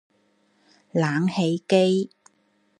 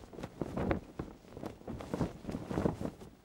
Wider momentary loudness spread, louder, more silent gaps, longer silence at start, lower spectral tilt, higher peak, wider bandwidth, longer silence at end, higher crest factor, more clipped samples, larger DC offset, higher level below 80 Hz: second, 8 LU vs 12 LU; first, -23 LUFS vs -40 LUFS; neither; first, 0.95 s vs 0 s; about the same, -6.5 dB/octave vs -7.5 dB/octave; first, -6 dBFS vs -16 dBFS; second, 11 kHz vs 16.5 kHz; first, 0.75 s vs 0.05 s; about the same, 20 dB vs 24 dB; neither; neither; second, -72 dBFS vs -52 dBFS